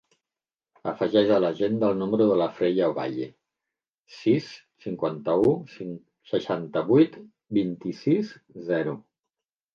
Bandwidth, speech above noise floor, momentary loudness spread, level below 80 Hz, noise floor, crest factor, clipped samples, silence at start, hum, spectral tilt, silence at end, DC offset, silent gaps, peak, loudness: 7 kHz; over 66 dB; 16 LU; -66 dBFS; under -90 dBFS; 18 dB; under 0.1%; 0.85 s; none; -8 dB/octave; 0.75 s; under 0.1%; 3.98-4.05 s; -8 dBFS; -25 LUFS